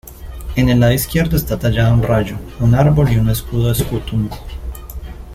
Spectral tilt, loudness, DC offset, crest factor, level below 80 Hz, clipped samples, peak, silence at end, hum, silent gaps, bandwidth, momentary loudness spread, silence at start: -6.5 dB/octave; -16 LUFS; under 0.1%; 14 dB; -28 dBFS; under 0.1%; -2 dBFS; 0 s; none; none; 16 kHz; 18 LU; 0.05 s